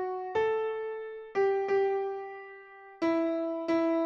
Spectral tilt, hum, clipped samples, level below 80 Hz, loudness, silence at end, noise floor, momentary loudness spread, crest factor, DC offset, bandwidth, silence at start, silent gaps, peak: -6 dB/octave; none; under 0.1%; -72 dBFS; -31 LUFS; 0 s; -50 dBFS; 16 LU; 12 dB; under 0.1%; 7 kHz; 0 s; none; -18 dBFS